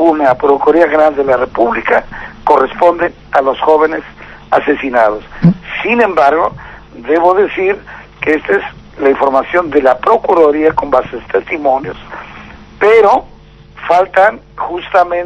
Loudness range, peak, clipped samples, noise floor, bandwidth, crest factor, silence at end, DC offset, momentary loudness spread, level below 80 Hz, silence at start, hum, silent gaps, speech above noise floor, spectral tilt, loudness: 2 LU; 0 dBFS; 0.9%; -36 dBFS; 8.2 kHz; 12 dB; 0 s; under 0.1%; 12 LU; -40 dBFS; 0 s; none; none; 25 dB; -7.5 dB/octave; -11 LUFS